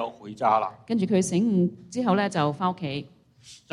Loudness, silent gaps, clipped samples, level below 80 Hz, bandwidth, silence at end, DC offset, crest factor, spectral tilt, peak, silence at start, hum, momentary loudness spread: -25 LUFS; none; under 0.1%; -66 dBFS; 11.5 kHz; 0.15 s; under 0.1%; 18 dB; -6 dB/octave; -8 dBFS; 0 s; none; 9 LU